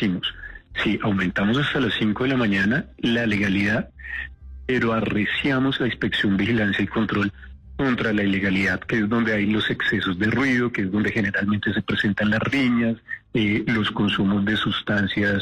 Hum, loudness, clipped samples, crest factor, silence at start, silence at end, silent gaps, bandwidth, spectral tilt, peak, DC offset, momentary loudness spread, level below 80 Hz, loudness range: none; -22 LUFS; under 0.1%; 10 dB; 0 s; 0 s; none; 9.6 kHz; -6.5 dB/octave; -12 dBFS; under 0.1%; 6 LU; -46 dBFS; 1 LU